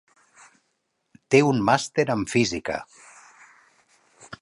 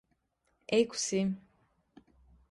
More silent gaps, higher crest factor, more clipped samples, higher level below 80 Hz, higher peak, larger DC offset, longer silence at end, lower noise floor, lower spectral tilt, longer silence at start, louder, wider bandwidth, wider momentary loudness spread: neither; about the same, 24 dB vs 20 dB; neither; first, -58 dBFS vs -68 dBFS; first, -2 dBFS vs -14 dBFS; neither; second, 0.05 s vs 1.1 s; about the same, -74 dBFS vs -77 dBFS; about the same, -5 dB/octave vs -4 dB/octave; first, 1.3 s vs 0.7 s; first, -22 LUFS vs -31 LUFS; about the same, 11.5 kHz vs 11.5 kHz; about the same, 16 LU vs 15 LU